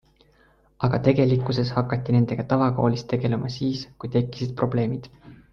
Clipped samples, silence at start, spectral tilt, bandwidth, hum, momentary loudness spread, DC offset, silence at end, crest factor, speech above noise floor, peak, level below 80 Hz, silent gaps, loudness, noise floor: under 0.1%; 0.8 s; -8.5 dB/octave; 6.8 kHz; none; 7 LU; under 0.1%; 0.15 s; 18 dB; 37 dB; -6 dBFS; -50 dBFS; none; -24 LUFS; -59 dBFS